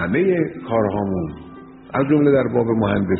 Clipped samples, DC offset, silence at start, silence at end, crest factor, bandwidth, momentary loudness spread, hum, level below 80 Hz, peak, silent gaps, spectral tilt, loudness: under 0.1%; under 0.1%; 0 s; 0 s; 14 dB; 4.1 kHz; 12 LU; none; -46 dBFS; -4 dBFS; none; -7.5 dB/octave; -19 LUFS